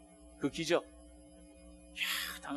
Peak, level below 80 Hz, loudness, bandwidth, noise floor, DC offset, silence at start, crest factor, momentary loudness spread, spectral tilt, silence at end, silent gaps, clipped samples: -14 dBFS; -62 dBFS; -36 LUFS; 13 kHz; -57 dBFS; under 0.1%; 0 s; 24 dB; 24 LU; -3 dB/octave; 0 s; none; under 0.1%